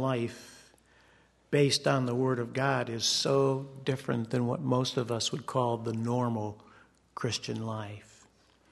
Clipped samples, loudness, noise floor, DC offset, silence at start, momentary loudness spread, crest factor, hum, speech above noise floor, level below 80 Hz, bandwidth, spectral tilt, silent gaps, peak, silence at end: under 0.1%; -30 LUFS; -63 dBFS; under 0.1%; 0 s; 14 LU; 20 dB; none; 33 dB; -68 dBFS; 12.5 kHz; -5 dB/octave; none; -12 dBFS; 0.7 s